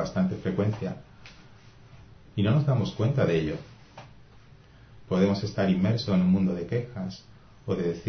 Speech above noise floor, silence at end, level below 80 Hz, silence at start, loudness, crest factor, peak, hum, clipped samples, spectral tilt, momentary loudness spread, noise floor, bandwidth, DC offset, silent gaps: 27 dB; 0 s; -52 dBFS; 0 s; -27 LUFS; 18 dB; -10 dBFS; none; under 0.1%; -8 dB/octave; 14 LU; -53 dBFS; 6.6 kHz; under 0.1%; none